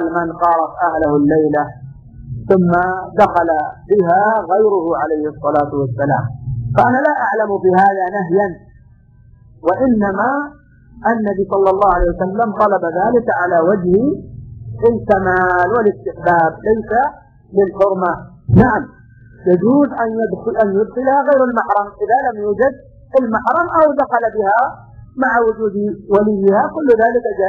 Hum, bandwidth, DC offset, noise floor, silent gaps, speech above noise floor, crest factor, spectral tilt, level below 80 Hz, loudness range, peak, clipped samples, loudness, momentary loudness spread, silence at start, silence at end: none; 6.8 kHz; under 0.1%; -45 dBFS; none; 31 dB; 14 dB; -10 dB/octave; -38 dBFS; 2 LU; 0 dBFS; under 0.1%; -15 LUFS; 7 LU; 0 s; 0 s